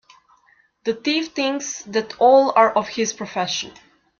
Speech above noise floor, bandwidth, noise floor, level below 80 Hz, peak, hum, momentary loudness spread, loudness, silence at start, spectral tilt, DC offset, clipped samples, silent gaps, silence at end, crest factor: 40 dB; 7.4 kHz; -59 dBFS; -66 dBFS; -2 dBFS; none; 13 LU; -20 LUFS; 0.85 s; -3 dB/octave; under 0.1%; under 0.1%; none; 0.5 s; 18 dB